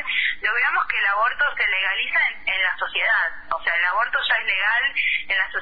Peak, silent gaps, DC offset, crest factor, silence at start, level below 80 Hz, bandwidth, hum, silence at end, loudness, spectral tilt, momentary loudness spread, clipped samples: -8 dBFS; none; 1%; 14 dB; 0 s; -52 dBFS; 5 kHz; none; 0 s; -20 LUFS; -2.5 dB/octave; 2 LU; under 0.1%